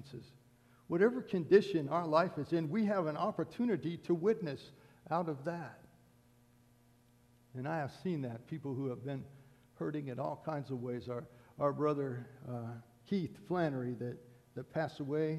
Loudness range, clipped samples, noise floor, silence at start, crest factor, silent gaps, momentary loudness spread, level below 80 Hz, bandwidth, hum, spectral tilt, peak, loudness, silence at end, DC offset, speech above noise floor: 10 LU; under 0.1%; -67 dBFS; 0 s; 24 dB; none; 15 LU; -74 dBFS; 13 kHz; none; -8 dB/octave; -14 dBFS; -37 LUFS; 0 s; under 0.1%; 31 dB